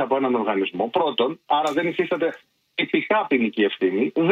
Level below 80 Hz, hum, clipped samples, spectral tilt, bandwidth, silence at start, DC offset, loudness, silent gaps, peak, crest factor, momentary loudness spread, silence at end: -72 dBFS; none; under 0.1%; -6 dB/octave; 9.8 kHz; 0 s; under 0.1%; -22 LUFS; none; -6 dBFS; 16 dB; 4 LU; 0 s